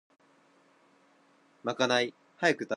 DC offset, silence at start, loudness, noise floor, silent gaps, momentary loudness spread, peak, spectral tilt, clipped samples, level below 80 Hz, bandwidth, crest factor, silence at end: under 0.1%; 1.65 s; -30 LUFS; -65 dBFS; none; 10 LU; -12 dBFS; -3.5 dB/octave; under 0.1%; -84 dBFS; 11.5 kHz; 22 dB; 0 s